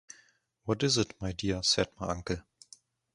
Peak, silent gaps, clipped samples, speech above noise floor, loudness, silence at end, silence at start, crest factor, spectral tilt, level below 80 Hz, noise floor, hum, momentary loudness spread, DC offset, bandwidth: -12 dBFS; none; under 0.1%; 35 dB; -31 LUFS; 0.75 s; 0.65 s; 22 dB; -3.5 dB/octave; -52 dBFS; -66 dBFS; none; 11 LU; under 0.1%; 11.5 kHz